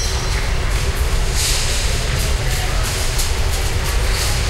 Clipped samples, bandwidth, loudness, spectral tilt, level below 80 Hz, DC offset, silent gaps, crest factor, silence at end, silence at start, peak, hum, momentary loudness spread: under 0.1%; 16 kHz; -19 LUFS; -3 dB/octave; -20 dBFS; under 0.1%; none; 12 dB; 0 s; 0 s; -4 dBFS; none; 3 LU